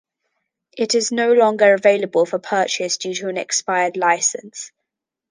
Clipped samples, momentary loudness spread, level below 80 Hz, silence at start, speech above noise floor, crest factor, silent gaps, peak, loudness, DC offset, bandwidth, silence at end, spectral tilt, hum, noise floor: under 0.1%; 12 LU; -74 dBFS; 0.75 s; 64 dB; 18 dB; none; -2 dBFS; -18 LUFS; under 0.1%; 10 kHz; 0.65 s; -2 dB/octave; none; -82 dBFS